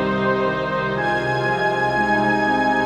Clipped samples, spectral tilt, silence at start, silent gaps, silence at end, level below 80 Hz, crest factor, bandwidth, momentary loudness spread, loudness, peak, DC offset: under 0.1%; -6 dB/octave; 0 s; none; 0 s; -46 dBFS; 12 dB; 12 kHz; 3 LU; -19 LUFS; -6 dBFS; 0.1%